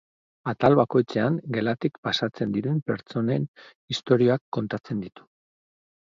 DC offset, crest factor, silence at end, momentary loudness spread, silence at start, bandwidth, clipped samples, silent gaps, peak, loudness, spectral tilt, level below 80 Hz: under 0.1%; 20 dB; 1.05 s; 12 LU; 0.45 s; 7.6 kHz; under 0.1%; 1.98-2.03 s, 3.48-3.54 s, 3.75-3.88 s, 4.41-4.52 s; -6 dBFS; -25 LUFS; -7 dB/octave; -62 dBFS